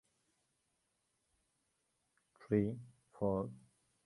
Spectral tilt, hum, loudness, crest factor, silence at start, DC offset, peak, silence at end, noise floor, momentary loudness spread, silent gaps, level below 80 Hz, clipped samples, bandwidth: -10 dB/octave; none; -39 LUFS; 24 dB; 2.4 s; under 0.1%; -20 dBFS; 0.45 s; -83 dBFS; 11 LU; none; -68 dBFS; under 0.1%; 11.5 kHz